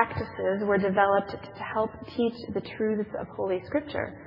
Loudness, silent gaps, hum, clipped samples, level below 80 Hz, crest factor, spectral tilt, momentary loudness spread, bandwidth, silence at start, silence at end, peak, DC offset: -28 LUFS; none; none; under 0.1%; -60 dBFS; 22 dB; -9 dB/octave; 11 LU; 5.8 kHz; 0 s; 0 s; -6 dBFS; under 0.1%